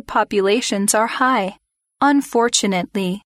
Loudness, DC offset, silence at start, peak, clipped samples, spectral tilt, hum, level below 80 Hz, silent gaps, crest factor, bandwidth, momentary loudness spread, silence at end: -18 LUFS; under 0.1%; 0.1 s; -2 dBFS; under 0.1%; -3.5 dB/octave; none; -54 dBFS; none; 16 dB; 16 kHz; 6 LU; 0.15 s